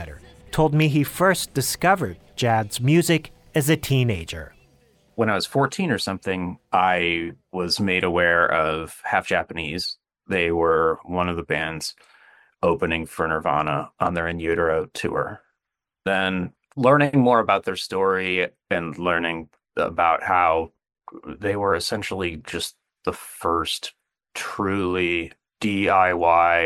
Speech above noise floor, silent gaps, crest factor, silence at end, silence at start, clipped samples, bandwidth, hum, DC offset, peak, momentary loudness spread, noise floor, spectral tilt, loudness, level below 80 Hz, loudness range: 63 dB; none; 18 dB; 0 s; 0 s; under 0.1%; 17.5 kHz; none; under 0.1%; -4 dBFS; 12 LU; -84 dBFS; -5 dB/octave; -22 LUFS; -52 dBFS; 5 LU